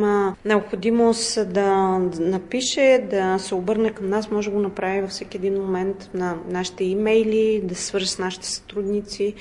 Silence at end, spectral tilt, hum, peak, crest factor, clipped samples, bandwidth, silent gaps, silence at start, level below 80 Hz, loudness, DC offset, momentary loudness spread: 0 s; -4.5 dB/octave; none; -6 dBFS; 16 dB; under 0.1%; 11 kHz; none; 0 s; -52 dBFS; -22 LUFS; under 0.1%; 8 LU